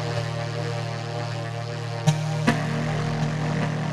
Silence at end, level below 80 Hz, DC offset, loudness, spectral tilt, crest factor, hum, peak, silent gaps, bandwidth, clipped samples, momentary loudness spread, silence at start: 0 s; -48 dBFS; under 0.1%; -26 LUFS; -6 dB/octave; 20 dB; none; -6 dBFS; none; 12 kHz; under 0.1%; 7 LU; 0 s